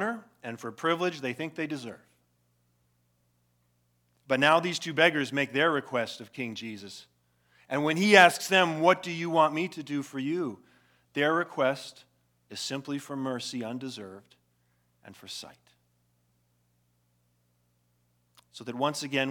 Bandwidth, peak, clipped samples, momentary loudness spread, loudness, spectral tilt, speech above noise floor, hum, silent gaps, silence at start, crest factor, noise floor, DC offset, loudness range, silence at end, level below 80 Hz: 19 kHz; -2 dBFS; under 0.1%; 18 LU; -27 LUFS; -4 dB/octave; 44 dB; 60 Hz at -60 dBFS; none; 0 s; 28 dB; -72 dBFS; under 0.1%; 15 LU; 0 s; -84 dBFS